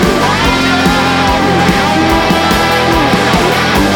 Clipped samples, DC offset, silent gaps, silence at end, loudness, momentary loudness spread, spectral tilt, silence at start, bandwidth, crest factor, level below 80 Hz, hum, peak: under 0.1%; under 0.1%; none; 0 s; -10 LUFS; 1 LU; -4.5 dB/octave; 0 s; over 20 kHz; 10 dB; -26 dBFS; none; 0 dBFS